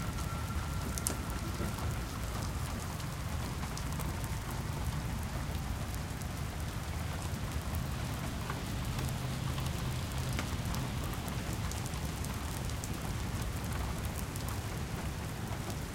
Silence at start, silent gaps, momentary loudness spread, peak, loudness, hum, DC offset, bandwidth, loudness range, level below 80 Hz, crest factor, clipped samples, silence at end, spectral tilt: 0 s; none; 3 LU; -6 dBFS; -38 LUFS; none; under 0.1%; 17 kHz; 1 LU; -42 dBFS; 30 dB; under 0.1%; 0 s; -5 dB/octave